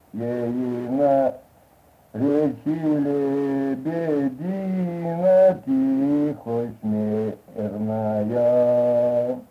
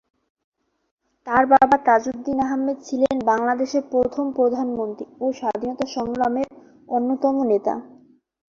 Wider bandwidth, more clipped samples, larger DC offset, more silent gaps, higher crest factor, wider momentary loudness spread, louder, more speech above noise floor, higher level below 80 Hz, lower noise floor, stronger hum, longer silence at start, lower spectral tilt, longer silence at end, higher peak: first, 14.5 kHz vs 7.4 kHz; neither; neither; neither; second, 14 dB vs 20 dB; about the same, 9 LU vs 11 LU; about the same, -22 LUFS vs -21 LUFS; about the same, 34 dB vs 32 dB; about the same, -62 dBFS vs -58 dBFS; about the same, -55 dBFS vs -52 dBFS; neither; second, 0.15 s vs 1.25 s; first, -9.5 dB/octave vs -5.5 dB/octave; second, 0.05 s vs 0.6 s; second, -8 dBFS vs -2 dBFS